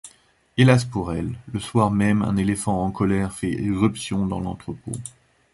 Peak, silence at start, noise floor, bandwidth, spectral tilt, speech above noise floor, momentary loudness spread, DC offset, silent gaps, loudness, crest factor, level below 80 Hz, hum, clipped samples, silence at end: -2 dBFS; 0.05 s; -56 dBFS; 11.5 kHz; -6.5 dB/octave; 35 dB; 14 LU; under 0.1%; none; -22 LUFS; 20 dB; -44 dBFS; none; under 0.1%; 0.45 s